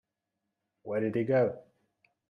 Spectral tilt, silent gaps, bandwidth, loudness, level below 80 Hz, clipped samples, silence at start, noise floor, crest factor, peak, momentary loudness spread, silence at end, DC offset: -10 dB/octave; none; 5 kHz; -30 LUFS; -76 dBFS; under 0.1%; 0.85 s; -85 dBFS; 18 dB; -16 dBFS; 21 LU; 0.7 s; under 0.1%